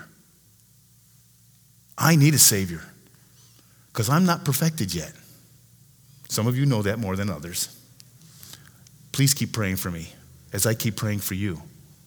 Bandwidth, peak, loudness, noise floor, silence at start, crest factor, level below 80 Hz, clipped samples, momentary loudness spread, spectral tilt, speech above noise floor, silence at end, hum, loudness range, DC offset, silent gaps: over 20 kHz; -2 dBFS; -23 LUFS; -57 dBFS; 0 s; 24 dB; -56 dBFS; under 0.1%; 21 LU; -4 dB/octave; 34 dB; 0.35 s; 60 Hz at -50 dBFS; 7 LU; under 0.1%; none